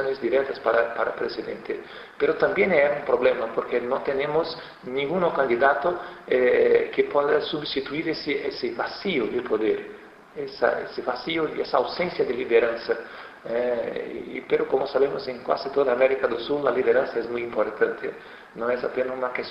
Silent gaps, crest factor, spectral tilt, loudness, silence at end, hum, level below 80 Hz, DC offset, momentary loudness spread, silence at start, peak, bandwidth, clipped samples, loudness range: none; 20 dB; -7 dB/octave; -24 LUFS; 0 s; none; -60 dBFS; under 0.1%; 12 LU; 0 s; -6 dBFS; 6 kHz; under 0.1%; 4 LU